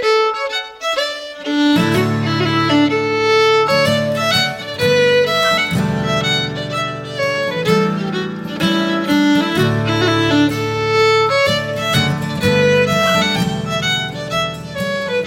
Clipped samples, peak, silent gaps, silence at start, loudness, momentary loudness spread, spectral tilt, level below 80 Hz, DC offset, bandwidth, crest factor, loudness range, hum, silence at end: under 0.1%; -2 dBFS; none; 0 s; -16 LUFS; 8 LU; -5 dB/octave; -46 dBFS; under 0.1%; 17 kHz; 14 dB; 3 LU; none; 0 s